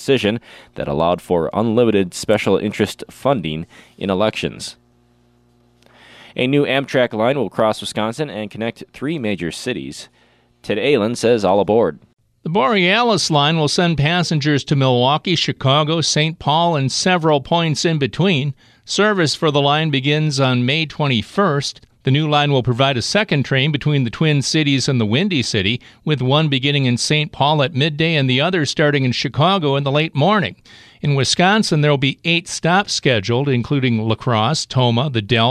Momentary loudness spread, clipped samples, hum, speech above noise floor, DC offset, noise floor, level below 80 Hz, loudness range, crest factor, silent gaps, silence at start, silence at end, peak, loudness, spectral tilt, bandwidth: 9 LU; under 0.1%; none; 39 dB; under 0.1%; -56 dBFS; -50 dBFS; 5 LU; 14 dB; 12.13-12.17 s; 0 s; 0 s; -2 dBFS; -17 LUFS; -5 dB/octave; 13 kHz